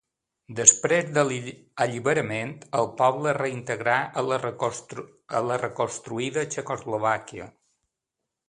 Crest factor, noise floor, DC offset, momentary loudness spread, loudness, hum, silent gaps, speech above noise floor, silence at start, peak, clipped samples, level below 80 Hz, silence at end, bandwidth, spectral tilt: 26 dB; -84 dBFS; under 0.1%; 14 LU; -24 LUFS; none; none; 59 dB; 0.5 s; 0 dBFS; under 0.1%; -66 dBFS; 1 s; 11 kHz; -3 dB/octave